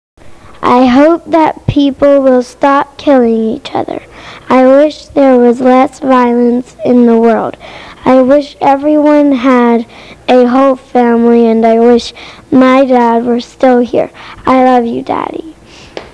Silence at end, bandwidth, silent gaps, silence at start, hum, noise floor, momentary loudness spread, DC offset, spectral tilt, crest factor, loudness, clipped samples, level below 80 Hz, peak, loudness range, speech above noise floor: 0.05 s; 10 kHz; none; 0.25 s; none; -29 dBFS; 11 LU; 0.3%; -6.5 dB/octave; 8 dB; -8 LUFS; 2%; -40 dBFS; 0 dBFS; 2 LU; 21 dB